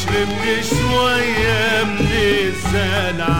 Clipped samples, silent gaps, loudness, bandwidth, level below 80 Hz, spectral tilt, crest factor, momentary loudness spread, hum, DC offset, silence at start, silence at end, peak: under 0.1%; none; -17 LUFS; 16.5 kHz; -30 dBFS; -4.5 dB/octave; 12 dB; 3 LU; none; 3%; 0 s; 0 s; -4 dBFS